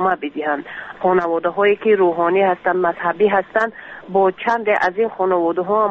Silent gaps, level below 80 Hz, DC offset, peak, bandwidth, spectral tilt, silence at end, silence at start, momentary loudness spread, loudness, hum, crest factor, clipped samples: none; -60 dBFS; under 0.1%; -4 dBFS; 6.6 kHz; -7 dB/octave; 0 s; 0 s; 7 LU; -18 LUFS; none; 12 dB; under 0.1%